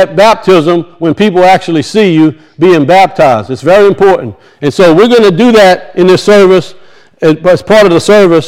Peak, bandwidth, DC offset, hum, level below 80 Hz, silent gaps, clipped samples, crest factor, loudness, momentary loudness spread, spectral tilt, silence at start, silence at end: 0 dBFS; 15.5 kHz; under 0.1%; none; -40 dBFS; none; 8%; 6 dB; -6 LUFS; 7 LU; -6 dB/octave; 0 s; 0 s